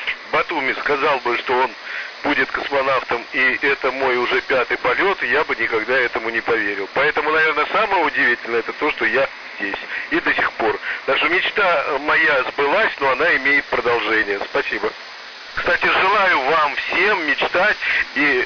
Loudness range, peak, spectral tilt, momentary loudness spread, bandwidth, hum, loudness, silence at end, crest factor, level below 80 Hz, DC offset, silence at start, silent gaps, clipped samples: 2 LU; -8 dBFS; -4 dB/octave; 7 LU; 5.4 kHz; none; -18 LUFS; 0 s; 10 dB; -52 dBFS; under 0.1%; 0 s; none; under 0.1%